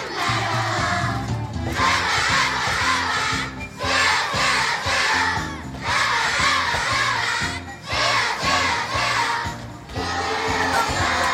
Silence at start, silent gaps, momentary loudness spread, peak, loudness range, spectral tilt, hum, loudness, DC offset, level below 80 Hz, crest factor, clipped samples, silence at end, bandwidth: 0 s; none; 8 LU; -6 dBFS; 2 LU; -2.5 dB/octave; none; -20 LUFS; under 0.1%; -42 dBFS; 16 dB; under 0.1%; 0 s; 16.5 kHz